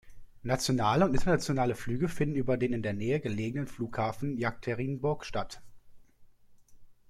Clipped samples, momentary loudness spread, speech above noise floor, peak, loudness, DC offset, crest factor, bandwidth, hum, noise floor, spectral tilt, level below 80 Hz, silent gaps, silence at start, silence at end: under 0.1%; 9 LU; 27 dB; -12 dBFS; -31 LUFS; under 0.1%; 20 dB; 14.5 kHz; none; -56 dBFS; -6 dB/octave; -48 dBFS; none; 0.05 s; 0.15 s